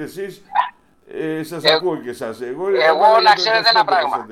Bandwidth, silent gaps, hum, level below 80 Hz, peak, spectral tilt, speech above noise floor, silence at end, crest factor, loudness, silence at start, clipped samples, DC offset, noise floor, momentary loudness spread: 15.5 kHz; none; none; -64 dBFS; 0 dBFS; -3.5 dB/octave; 22 dB; 0 s; 18 dB; -16 LUFS; 0 s; under 0.1%; under 0.1%; -39 dBFS; 16 LU